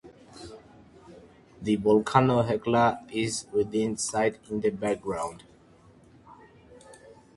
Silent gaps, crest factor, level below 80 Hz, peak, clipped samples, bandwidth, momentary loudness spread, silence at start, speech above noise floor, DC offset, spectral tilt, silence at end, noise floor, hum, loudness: none; 24 dB; -58 dBFS; -4 dBFS; under 0.1%; 11.5 kHz; 14 LU; 0.05 s; 30 dB; under 0.1%; -5.5 dB/octave; 0.45 s; -56 dBFS; none; -26 LUFS